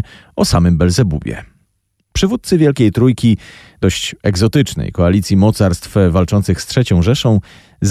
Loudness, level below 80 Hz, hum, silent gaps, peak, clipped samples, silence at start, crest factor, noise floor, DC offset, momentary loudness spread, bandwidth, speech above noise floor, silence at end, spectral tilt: -14 LUFS; -32 dBFS; none; none; -2 dBFS; under 0.1%; 0 s; 12 dB; -65 dBFS; under 0.1%; 7 LU; 14.5 kHz; 52 dB; 0 s; -6 dB/octave